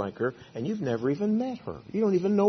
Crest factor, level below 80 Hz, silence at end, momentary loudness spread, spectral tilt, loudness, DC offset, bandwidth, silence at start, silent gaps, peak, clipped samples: 16 dB; -66 dBFS; 0 s; 9 LU; -8 dB/octave; -29 LUFS; under 0.1%; 6.4 kHz; 0 s; none; -12 dBFS; under 0.1%